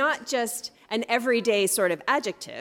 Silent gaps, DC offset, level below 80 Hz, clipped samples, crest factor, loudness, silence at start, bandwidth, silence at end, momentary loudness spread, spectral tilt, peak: none; under 0.1%; -74 dBFS; under 0.1%; 16 dB; -25 LUFS; 0 s; 17.5 kHz; 0 s; 9 LU; -2.5 dB/octave; -10 dBFS